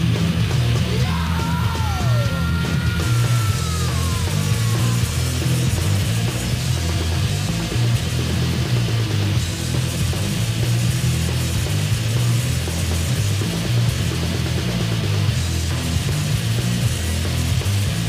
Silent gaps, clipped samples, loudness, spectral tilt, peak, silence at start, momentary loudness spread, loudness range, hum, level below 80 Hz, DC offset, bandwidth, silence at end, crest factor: none; under 0.1%; -20 LUFS; -5 dB/octave; -6 dBFS; 0 s; 2 LU; 1 LU; none; -30 dBFS; under 0.1%; 15.5 kHz; 0 s; 12 dB